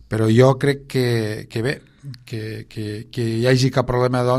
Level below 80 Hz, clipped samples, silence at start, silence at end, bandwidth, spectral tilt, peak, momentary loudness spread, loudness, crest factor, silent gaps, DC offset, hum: -44 dBFS; under 0.1%; 0.1 s; 0 s; 13 kHz; -6.5 dB/octave; -2 dBFS; 16 LU; -20 LUFS; 18 dB; none; under 0.1%; none